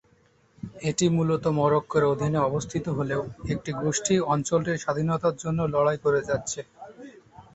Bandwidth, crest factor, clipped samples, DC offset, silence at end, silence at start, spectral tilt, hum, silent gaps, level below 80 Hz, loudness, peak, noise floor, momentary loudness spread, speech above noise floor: 8.2 kHz; 16 dB; under 0.1%; under 0.1%; 0.15 s; 0.65 s; -5.5 dB/octave; none; none; -54 dBFS; -26 LUFS; -10 dBFS; -62 dBFS; 10 LU; 37 dB